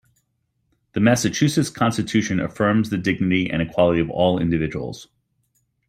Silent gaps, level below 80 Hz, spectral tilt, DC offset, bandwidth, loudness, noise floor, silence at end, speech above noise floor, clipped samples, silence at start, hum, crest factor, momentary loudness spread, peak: none; -50 dBFS; -5.5 dB/octave; under 0.1%; 16 kHz; -20 LUFS; -71 dBFS; 0.85 s; 51 dB; under 0.1%; 0.95 s; none; 18 dB; 7 LU; -2 dBFS